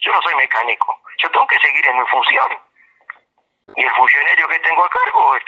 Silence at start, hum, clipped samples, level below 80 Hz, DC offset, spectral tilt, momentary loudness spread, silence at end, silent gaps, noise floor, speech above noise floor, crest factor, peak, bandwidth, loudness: 0 s; none; under 0.1%; -68 dBFS; under 0.1%; -1.5 dB/octave; 8 LU; 0.05 s; none; -64 dBFS; 49 dB; 16 dB; 0 dBFS; 7.4 kHz; -13 LUFS